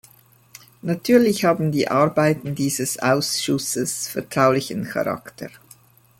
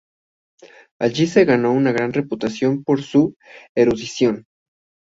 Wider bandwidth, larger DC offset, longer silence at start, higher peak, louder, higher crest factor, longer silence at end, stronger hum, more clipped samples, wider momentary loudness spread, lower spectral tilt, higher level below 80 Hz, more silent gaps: first, 17 kHz vs 7.8 kHz; neither; second, 0.85 s vs 1 s; about the same, -4 dBFS vs -2 dBFS; about the same, -20 LUFS vs -19 LUFS; about the same, 18 dB vs 18 dB; about the same, 0.7 s vs 0.65 s; neither; neither; first, 11 LU vs 8 LU; second, -4.5 dB/octave vs -6 dB/octave; about the same, -60 dBFS vs -56 dBFS; second, none vs 3.36-3.40 s, 3.69-3.75 s